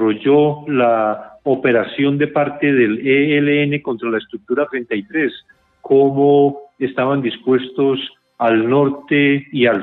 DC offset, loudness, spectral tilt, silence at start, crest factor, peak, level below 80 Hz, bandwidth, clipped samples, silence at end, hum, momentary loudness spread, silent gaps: under 0.1%; -16 LUFS; -10 dB/octave; 0 s; 14 dB; -2 dBFS; -62 dBFS; 4.1 kHz; under 0.1%; 0 s; none; 8 LU; none